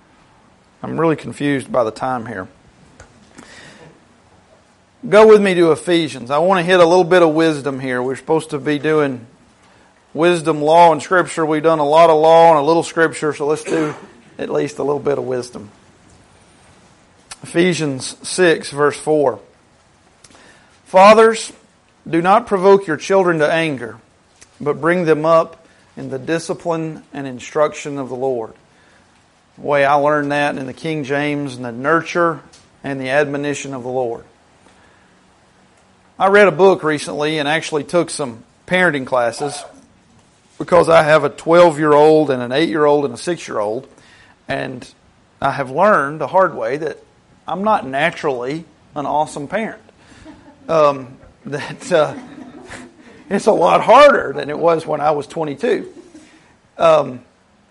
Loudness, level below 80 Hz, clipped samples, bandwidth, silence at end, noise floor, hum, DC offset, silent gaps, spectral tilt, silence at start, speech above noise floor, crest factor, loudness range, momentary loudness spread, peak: -15 LUFS; -56 dBFS; under 0.1%; 11.5 kHz; 0.5 s; -53 dBFS; none; under 0.1%; none; -5 dB/octave; 0.85 s; 38 dB; 16 dB; 9 LU; 18 LU; 0 dBFS